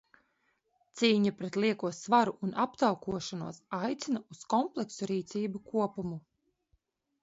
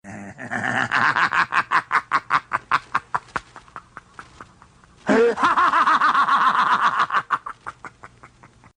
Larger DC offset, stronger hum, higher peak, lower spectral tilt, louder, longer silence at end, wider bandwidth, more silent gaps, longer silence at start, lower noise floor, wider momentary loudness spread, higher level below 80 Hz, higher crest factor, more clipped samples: neither; neither; second, -10 dBFS vs -4 dBFS; about the same, -5 dB/octave vs -4 dB/octave; second, -32 LUFS vs -19 LUFS; first, 1.05 s vs 0.5 s; second, 8 kHz vs 10.5 kHz; neither; first, 0.95 s vs 0.05 s; first, -76 dBFS vs -51 dBFS; second, 12 LU vs 19 LU; second, -70 dBFS vs -58 dBFS; about the same, 22 dB vs 18 dB; neither